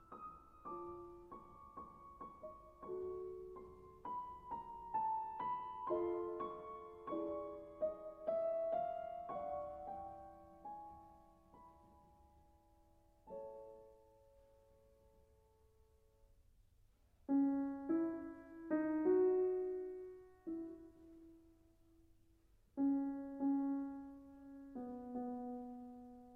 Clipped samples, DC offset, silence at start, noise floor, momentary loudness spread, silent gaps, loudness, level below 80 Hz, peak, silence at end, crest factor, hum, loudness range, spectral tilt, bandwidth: under 0.1%; under 0.1%; 0 s; -71 dBFS; 19 LU; none; -43 LUFS; -72 dBFS; -26 dBFS; 0 s; 20 dB; none; 20 LU; -9 dB/octave; 3.6 kHz